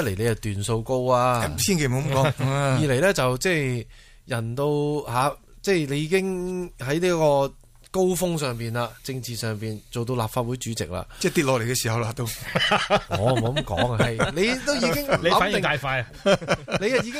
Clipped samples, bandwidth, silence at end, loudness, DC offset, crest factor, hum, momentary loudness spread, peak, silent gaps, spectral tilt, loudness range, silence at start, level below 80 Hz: under 0.1%; 15.5 kHz; 0 s; -24 LUFS; under 0.1%; 16 dB; none; 9 LU; -8 dBFS; none; -5 dB/octave; 4 LU; 0 s; -44 dBFS